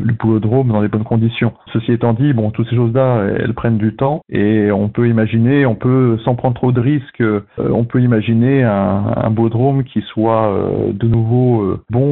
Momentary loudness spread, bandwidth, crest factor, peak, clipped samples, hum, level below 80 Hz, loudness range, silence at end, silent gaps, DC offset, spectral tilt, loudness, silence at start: 4 LU; 4 kHz; 14 dB; 0 dBFS; under 0.1%; none; -42 dBFS; 1 LU; 0 s; none; 0.2%; -8 dB/octave; -15 LUFS; 0 s